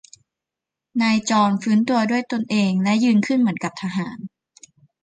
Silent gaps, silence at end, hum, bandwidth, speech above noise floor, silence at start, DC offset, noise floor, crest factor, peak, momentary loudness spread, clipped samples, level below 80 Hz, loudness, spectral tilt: none; 0.75 s; none; 9.4 kHz; 67 dB; 0.95 s; under 0.1%; -86 dBFS; 14 dB; -6 dBFS; 10 LU; under 0.1%; -64 dBFS; -20 LUFS; -5.5 dB/octave